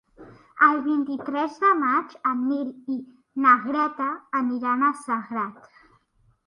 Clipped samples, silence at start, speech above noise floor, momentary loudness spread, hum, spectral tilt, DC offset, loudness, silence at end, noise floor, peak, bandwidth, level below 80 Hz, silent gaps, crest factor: under 0.1%; 0.2 s; 40 dB; 13 LU; none; -5.5 dB/octave; under 0.1%; -23 LUFS; 0.95 s; -64 dBFS; -4 dBFS; 11 kHz; -72 dBFS; none; 22 dB